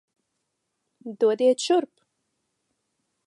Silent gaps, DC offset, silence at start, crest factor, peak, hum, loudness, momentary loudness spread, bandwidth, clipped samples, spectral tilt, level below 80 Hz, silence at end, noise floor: none; under 0.1%; 1.05 s; 18 dB; -10 dBFS; none; -22 LUFS; 21 LU; 11.5 kHz; under 0.1%; -3.5 dB/octave; -84 dBFS; 1.4 s; -79 dBFS